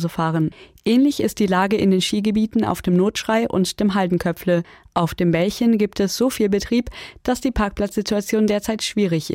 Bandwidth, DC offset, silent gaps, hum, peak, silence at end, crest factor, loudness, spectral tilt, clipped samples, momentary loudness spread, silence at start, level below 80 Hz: 16.5 kHz; under 0.1%; none; none; -6 dBFS; 0 s; 14 dB; -20 LUFS; -5.5 dB/octave; under 0.1%; 6 LU; 0 s; -42 dBFS